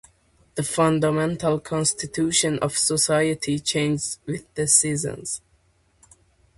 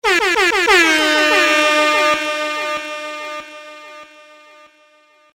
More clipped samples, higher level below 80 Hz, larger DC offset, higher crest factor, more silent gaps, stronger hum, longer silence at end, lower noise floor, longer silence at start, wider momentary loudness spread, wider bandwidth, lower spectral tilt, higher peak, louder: neither; about the same, -56 dBFS vs -52 dBFS; neither; first, 22 dB vs 16 dB; neither; neither; about the same, 1.2 s vs 1.3 s; first, -62 dBFS vs -52 dBFS; first, 0.55 s vs 0.05 s; second, 13 LU vs 20 LU; second, 12 kHz vs 16.5 kHz; first, -3.5 dB/octave vs -0.5 dB/octave; about the same, -2 dBFS vs -2 dBFS; second, -22 LUFS vs -14 LUFS